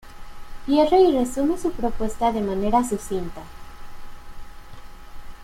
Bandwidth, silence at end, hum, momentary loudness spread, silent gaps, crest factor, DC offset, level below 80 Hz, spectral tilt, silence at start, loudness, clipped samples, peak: 16 kHz; 0 s; none; 19 LU; none; 18 dB; under 0.1%; -38 dBFS; -5.5 dB/octave; 0.05 s; -22 LUFS; under 0.1%; -6 dBFS